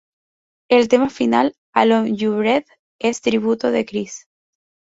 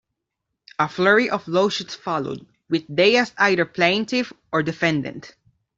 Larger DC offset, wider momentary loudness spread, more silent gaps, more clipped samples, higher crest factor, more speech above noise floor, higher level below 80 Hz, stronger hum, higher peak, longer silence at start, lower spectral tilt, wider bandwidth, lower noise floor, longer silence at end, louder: neither; second, 9 LU vs 12 LU; first, 1.58-1.73 s, 2.79-2.99 s vs none; neither; about the same, 18 dB vs 18 dB; first, over 73 dB vs 60 dB; about the same, -60 dBFS vs -62 dBFS; neither; about the same, -2 dBFS vs -4 dBFS; about the same, 0.7 s vs 0.8 s; about the same, -5 dB/octave vs -5 dB/octave; about the same, 8 kHz vs 7.8 kHz; first, under -90 dBFS vs -81 dBFS; first, 0.7 s vs 0.5 s; about the same, -18 LUFS vs -20 LUFS